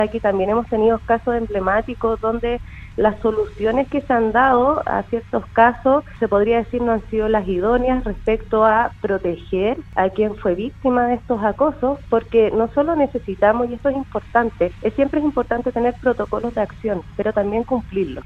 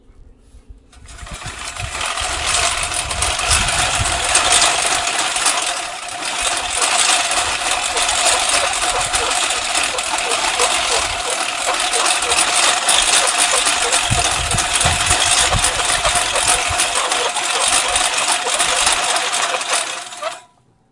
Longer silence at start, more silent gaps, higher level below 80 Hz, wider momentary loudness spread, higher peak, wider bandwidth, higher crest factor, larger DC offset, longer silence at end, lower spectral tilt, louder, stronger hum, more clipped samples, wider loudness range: second, 0 s vs 0.3 s; neither; about the same, -38 dBFS vs -36 dBFS; about the same, 7 LU vs 8 LU; about the same, 0 dBFS vs 0 dBFS; second, 6.6 kHz vs 11.5 kHz; about the same, 18 dB vs 18 dB; neither; second, 0 s vs 0.5 s; first, -8 dB/octave vs 0 dB/octave; second, -19 LUFS vs -15 LUFS; neither; neither; about the same, 3 LU vs 3 LU